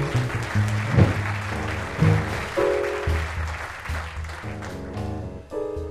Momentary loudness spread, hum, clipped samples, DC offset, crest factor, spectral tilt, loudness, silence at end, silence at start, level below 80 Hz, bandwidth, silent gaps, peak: 13 LU; none; under 0.1%; under 0.1%; 22 dB; -6.5 dB/octave; -25 LUFS; 0 s; 0 s; -36 dBFS; 13.5 kHz; none; -2 dBFS